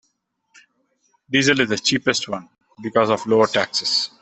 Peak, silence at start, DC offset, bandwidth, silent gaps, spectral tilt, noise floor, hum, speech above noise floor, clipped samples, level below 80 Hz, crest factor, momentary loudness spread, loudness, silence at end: -2 dBFS; 1.3 s; under 0.1%; 8.6 kHz; none; -3.5 dB/octave; -71 dBFS; none; 51 dB; under 0.1%; -60 dBFS; 20 dB; 8 LU; -19 LUFS; 0.15 s